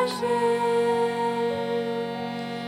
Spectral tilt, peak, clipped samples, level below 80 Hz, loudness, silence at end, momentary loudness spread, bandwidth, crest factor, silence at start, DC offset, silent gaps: -5 dB/octave; -12 dBFS; under 0.1%; -68 dBFS; -25 LUFS; 0 s; 8 LU; 15.5 kHz; 12 dB; 0 s; under 0.1%; none